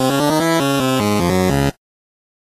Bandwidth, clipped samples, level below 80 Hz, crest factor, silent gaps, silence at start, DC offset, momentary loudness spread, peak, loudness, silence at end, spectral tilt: 14.5 kHz; under 0.1%; -38 dBFS; 14 dB; none; 0 s; under 0.1%; 2 LU; -4 dBFS; -16 LUFS; 0.75 s; -5 dB/octave